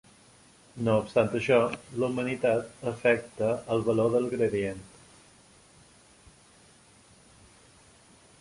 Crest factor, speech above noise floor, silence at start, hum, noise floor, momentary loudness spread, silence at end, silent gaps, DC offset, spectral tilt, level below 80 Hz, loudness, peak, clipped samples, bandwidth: 22 dB; 31 dB; 0.75 s; none; -57 dBFS; 8 LU; 3.55 s; none; under 0.1%; -6.5 dB/octave; -62 dBFS; -27 LUFS; -8 dBFS; under 0.1%; 11.5 kHz